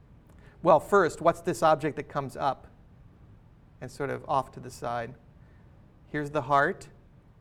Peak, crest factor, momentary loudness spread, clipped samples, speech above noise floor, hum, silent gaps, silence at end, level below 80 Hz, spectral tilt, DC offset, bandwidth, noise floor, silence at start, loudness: -6 dBFS; 24 dB; 17 LU; under 0.1%; 27 dB; none; none; 0.55 s; -56 dBFS; -6 dB/octave; under 0.1%; 16 kHz; -54 dBFS; 0.65 s; -27 LUFS